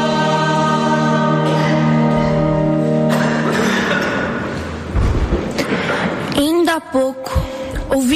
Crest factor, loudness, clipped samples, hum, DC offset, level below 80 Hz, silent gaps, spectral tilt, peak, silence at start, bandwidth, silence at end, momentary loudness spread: 12 dB; -16 LUFS; under 0.1%; none; under 0.1%; -28 dBFS; none; -6 dB/octave; -4 dBFS; 0 s; 15 kHz; 0 s; 7 LU